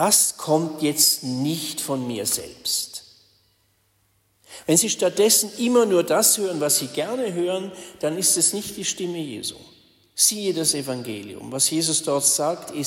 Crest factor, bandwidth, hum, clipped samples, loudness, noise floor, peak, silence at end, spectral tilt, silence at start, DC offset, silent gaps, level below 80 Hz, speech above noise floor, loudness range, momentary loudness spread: 20 dB; 16.5 kHz; none; under 0.1%; -21 LUFS; -65 dBFS; -4 dBFS; 0 s; -2.5 dB/octave; 0 s; under 0.1%; none; -66 dBFS; 43 dB; 5 LU; 13 LU